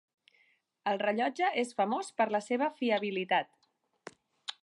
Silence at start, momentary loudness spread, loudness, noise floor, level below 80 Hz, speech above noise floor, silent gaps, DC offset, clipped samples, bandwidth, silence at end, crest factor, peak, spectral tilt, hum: 0.85 s; 20 LU; -31 LUFS; -71 dBFS; -88 dBFS; 40 dB; none; under 0.1%; under 0.1%; 11.5 kHz; 0.1 s; 18 dB; -16 dBFS; -4.5 dB/octave; none